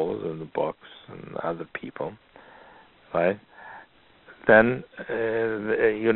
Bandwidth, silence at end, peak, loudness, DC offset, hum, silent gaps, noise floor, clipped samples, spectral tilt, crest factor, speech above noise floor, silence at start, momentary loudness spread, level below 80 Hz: 4.2 kHz; 0 s; -4 dBFS; -25 LUFS; under 0.1%; none; none; -54 dBFS; under 0.1%; -4.5 dB/octave; 24 dB; 29 dB; 0 s; 25 LU; -58 dBFS